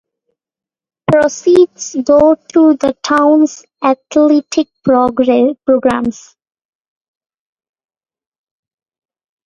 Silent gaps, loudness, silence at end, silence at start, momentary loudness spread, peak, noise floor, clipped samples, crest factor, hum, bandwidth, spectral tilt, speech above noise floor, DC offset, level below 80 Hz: none; -12 LUFS; 3.35 s; 1.1 s; 8 LU; 0 dBFS; -89 dBFS; under 0.1%; 14 dB; none; 9.8 kHz; -5.5 dB/octave; 78 dB; under 0.1%; -50 dBFS